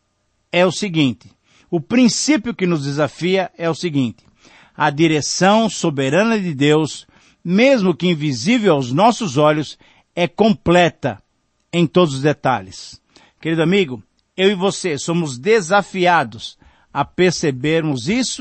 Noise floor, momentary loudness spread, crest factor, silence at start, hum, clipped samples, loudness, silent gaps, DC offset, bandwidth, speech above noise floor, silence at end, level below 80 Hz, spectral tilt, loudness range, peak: -66 dBFS; 12 LU; 16 dB; 0.55 s; none; under 0.1%; -17 LUFS; none; under 0.1%; 8.8 kHz; 50 dB; 0 s; -52 dBFS; -5 dB/octave; 3 LU; -2 dBFS